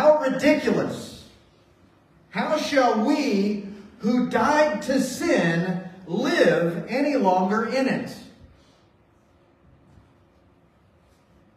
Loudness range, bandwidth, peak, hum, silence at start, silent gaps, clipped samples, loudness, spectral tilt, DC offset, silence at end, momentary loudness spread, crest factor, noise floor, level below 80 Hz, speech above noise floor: 5 LU; 15.5 kHz; -6 dBFS; none; 0 s; none; under 0.1%; -22 LUFS; -5.5 dB/octave; under 0.1%; 3.25 s; 12 LU; 18 dB; -59 dBFS; -60 dBFS; 37 dB